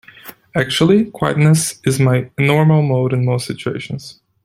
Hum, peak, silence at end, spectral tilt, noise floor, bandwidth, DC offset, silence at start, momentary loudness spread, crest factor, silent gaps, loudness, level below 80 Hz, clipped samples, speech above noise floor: none; -2 dBFS; 0.3 s; -6 dB/octave; -40 dBFS; 16 kHz; under 0.1%; 0.25 s; 11 LU; 14 dB; none; -15 LUFS; -50 dBFS; under 0.1%; 25 dB